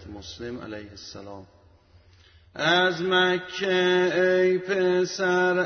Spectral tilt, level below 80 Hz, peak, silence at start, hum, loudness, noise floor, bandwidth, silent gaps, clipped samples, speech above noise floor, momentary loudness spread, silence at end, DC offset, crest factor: -4.5 dB/octave; -60 dBFS; -10 dBFS; 0 s; none; -22 LUFS; -56 dBFS; 6.6 kHz; none; under 0.1%; 32 dB; 19 LU; 0 s; under 0.1%; 16 dB